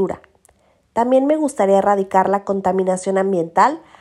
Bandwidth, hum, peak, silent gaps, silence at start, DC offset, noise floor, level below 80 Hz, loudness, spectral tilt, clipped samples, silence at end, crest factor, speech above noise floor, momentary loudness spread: 12 kHz; none; 0 dBFS; none; 0 s; under 0.1%; -58 dBFS; -58 dBFS; -17 LUFS; -6.5 dB/octave; under 0.1%; 0.2 s; 16 dB; 41 dB; 6 LU